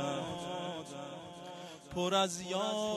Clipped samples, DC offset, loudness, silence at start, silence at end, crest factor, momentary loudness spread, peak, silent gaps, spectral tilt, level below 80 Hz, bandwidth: under 0.1%; under 0.1%; -36 LUFS; 0 s; 0 s; 18 dB; 16 LU; -18 dBFS; none; -4 dB/octave; -68 dBFS; 14.5 kHz